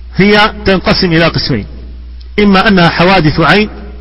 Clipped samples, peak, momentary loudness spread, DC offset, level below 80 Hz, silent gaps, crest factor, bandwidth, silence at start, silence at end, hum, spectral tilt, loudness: 0.6%; 0 dBFS; 10 LU; under 0.1%; -26 dBFS; none; 10 dB; 11 kHz; 0 s; 0 s; none; -7 dB/octave; -8 LUFS